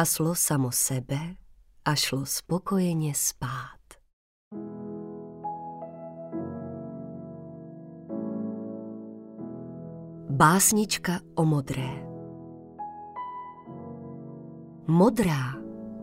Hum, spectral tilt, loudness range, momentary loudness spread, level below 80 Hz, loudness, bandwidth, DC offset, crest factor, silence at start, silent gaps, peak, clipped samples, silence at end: none; -4.5 dB/octave; 13 LU; 21 LU; -56 dBFS; -27 LUFS; 16 kHz; under 0.1%; 24 dB; 0 s; 4.13-4.51 s; -6 dBFS; under 0.1%; 0 s